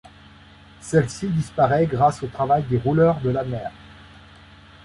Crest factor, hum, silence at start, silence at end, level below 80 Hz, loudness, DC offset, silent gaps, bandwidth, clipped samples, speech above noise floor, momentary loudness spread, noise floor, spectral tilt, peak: 18 dB; none; 0.8 s; 0.8 s; -48 dBFS; -21 LUFS; under 0.1%; none; 11.5 kHz; under 0.1%; 27 dB; 11 LU; -47 dBFS; -7 dB/octave; -6 dBFS